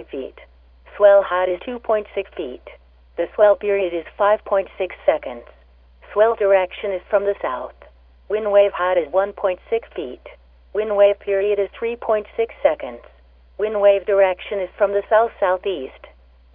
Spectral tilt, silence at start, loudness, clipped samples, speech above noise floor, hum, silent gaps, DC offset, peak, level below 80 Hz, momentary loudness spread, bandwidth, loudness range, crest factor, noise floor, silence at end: -8.5 dB/octave; 0 s; -19 LUFS; under 0.1%; 31 dB; none; none; under 0.1%; -2 dBFS; -50 dBFS; 15 LU; 3.8 kHz; 2 LU; 18 dB; -50 dBFS; 0.65 s